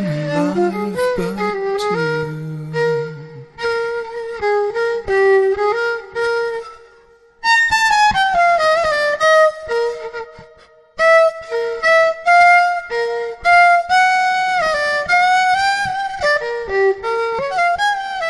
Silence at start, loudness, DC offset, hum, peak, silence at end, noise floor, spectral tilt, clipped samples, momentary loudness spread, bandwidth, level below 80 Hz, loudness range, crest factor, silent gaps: 0 s; -15 LUFS; under 0.1%; none; -2 dBFS; 0 s; -49 dBFS; -4 dB/octave; under 0.1%; 11 LU; 12 kHz; -48 dBFS; 7 LU; 14 dB; none